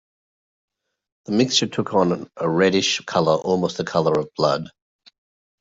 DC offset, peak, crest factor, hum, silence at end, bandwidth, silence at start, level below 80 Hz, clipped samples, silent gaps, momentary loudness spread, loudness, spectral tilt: under 0.1%; -4 dBFS; 18 dB; none; 0.9 s; 8 kHz; 1.3 s; -62 dBFS; under 0.1%; none; 6 LU; -20 LUFS; -4.5 dB/octave